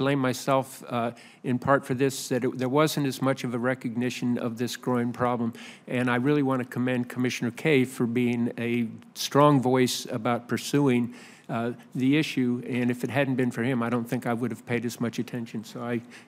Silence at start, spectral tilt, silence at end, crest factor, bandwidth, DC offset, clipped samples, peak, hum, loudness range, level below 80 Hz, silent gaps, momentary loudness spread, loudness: 0 s; -5.5 dB/octave; 0.05 s; 20 dB; 16 kHz; under 0.1%; under 0.1%; -6 dBFS; none; 3 LU; -72 dBFS; none; 9 LU; -27 LUFS